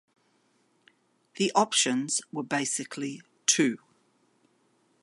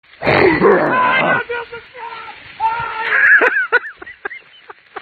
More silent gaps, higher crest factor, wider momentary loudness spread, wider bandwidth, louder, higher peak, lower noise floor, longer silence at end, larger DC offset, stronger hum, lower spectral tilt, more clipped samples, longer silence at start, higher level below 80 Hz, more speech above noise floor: neither; first, 24 dB vs 16 dB; second, 12 LU vs 21 LU; first, 11.5 kHz vs 7 kHz; second, -27 LUFS vs -13 LUFS; second, -8 dBFS vs 0 dBFS; first, -69 dBFS vs -42 dBFS; first, 1.25 s vs 0 s; neither; neither; second, -2 dB/octave vs -7 dB/octave; neither; first, 1.35 s vs 0.2 s; second, -80 dBFS vs -48 dBFS; first, 41 dB vs 28 dB